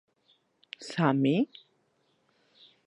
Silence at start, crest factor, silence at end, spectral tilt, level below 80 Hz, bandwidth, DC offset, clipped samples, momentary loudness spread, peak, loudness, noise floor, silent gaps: 0.8 s; 22 dB; 1.4 s; -7 dB/octave; -82 dBFS; 10.5 kHz; under 0.1%; under 0.1%; 19 LU; -10 dBFS; -28 LUFS; -72 dBFS; none